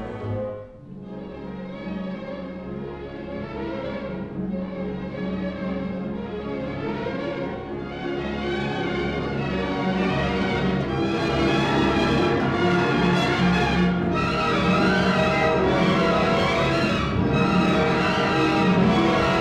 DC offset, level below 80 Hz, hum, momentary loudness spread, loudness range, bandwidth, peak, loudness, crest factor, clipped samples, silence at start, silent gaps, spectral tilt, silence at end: under 0.1%; -40 dBFS; none; 14 LU; 11 LU; 10 kHz; -8 dBFS; -23 LUFS; 14 dB; under 0.1%; 0 s; none; -6.5 dB/octave; 0 s